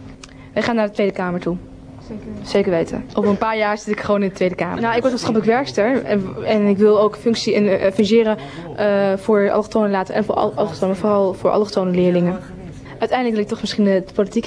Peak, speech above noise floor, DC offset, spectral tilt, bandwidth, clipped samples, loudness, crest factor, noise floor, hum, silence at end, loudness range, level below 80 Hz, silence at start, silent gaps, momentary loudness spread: -4 dBFS; 20 dB; under 0.1%; -6.5 dB/octave; 10.5 kHz; under 0.1%; -18 LUFS; 14 dB; -38 dBFS; none; 0 s; 4 LU; -48 dBFS; 0 s; none; 10 LU